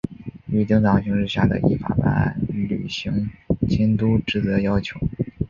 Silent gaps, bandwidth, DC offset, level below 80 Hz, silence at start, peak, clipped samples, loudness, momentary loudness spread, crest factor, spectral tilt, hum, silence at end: none; 7.2 kHz; under 0.1%; -38 dBFS; 0.05 s; -2 dBFS; under 0.1%; -21 LUFS; 8 LU; 18 dB; -8 dB/octave; none; 0.05 s